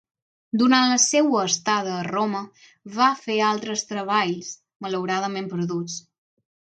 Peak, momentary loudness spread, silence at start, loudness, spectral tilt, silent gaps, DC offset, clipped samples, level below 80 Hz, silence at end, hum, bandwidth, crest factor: -4 dBFS; 15 LU; 0.55 s; -22 LUFS; -3 dB/octave; 4.76-4.80 s; under 0.1%; under 0.1%; -74 dBFS; 0.7 s; none; 9.4 kHz; 20 dB